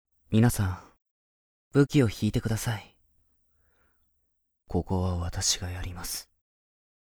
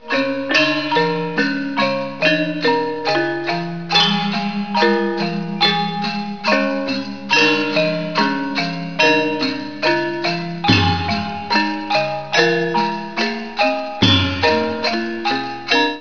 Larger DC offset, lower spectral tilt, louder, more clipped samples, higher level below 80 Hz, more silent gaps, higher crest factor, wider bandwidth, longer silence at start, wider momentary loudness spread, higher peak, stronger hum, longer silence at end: second, under 0.1% vs 1%; about the same, -5 dB/octave vs -5 dB/octave; second, -28 LUFS vs -17 LUFS; neither; first, -46 dBFS vs -52 dBFS; first, 1.11-1.71 s vs none; about the same, 22 dB vs 18 dB; first, over 20 kHz vs 5.4 kHz; first, 0.3 s vs 0 s; first, 13 LU vs 8 LU; second, -8 dBFS vs 0 dBFS; neither; first, 0.85 s vs 0 s